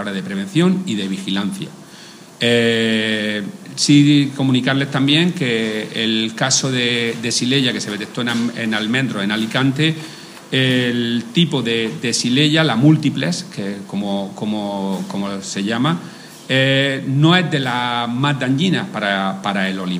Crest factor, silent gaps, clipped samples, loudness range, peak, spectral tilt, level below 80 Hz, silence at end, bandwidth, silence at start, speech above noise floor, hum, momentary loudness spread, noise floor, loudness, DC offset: 16 dB; none; under 0.1%; 4 LU; 0 dBFS; -4.5 dB/octave; -64 dBFS; 0 s; 15.5 kHz; 0 s; 22 dB; none; 10 LU; -39 dBFS; -17 LUFS; under 0.1%